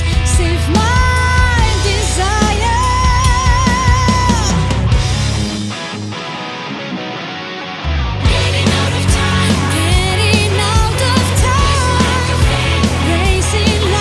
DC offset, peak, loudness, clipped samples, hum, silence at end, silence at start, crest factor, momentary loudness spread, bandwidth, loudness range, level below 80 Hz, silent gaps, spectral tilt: under 0.1%; 0 dBFS; -14 LUFS; under 0.1%; none; 0 s; 0 s; 12 dB; 10 LU; 12 kHz; 6 LU; -20 dBFS; none; -4.5 dB/octave